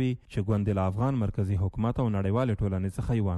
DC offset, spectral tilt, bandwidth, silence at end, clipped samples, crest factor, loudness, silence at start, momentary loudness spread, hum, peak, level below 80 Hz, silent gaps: under 0.1%; -9 dB/octave; 11.5 kHz; 0 s; under 0.1%; 12 dB; -28 LUFS; 0 s; 3 LU; none; -16 dBFS; -44 dBFS; none